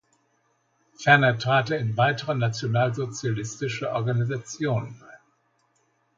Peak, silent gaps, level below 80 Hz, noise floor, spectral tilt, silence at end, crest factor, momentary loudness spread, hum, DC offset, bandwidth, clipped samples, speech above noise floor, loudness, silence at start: -2 dBFS; none; -64 dBFS; -69 dBFS; -5.5 dB/octave; 1 s; 22 dB; 11 LU; none; under 0.1%; 7.6 kHz; under 0.1%; 45 dB; -24 LUFS; 1 s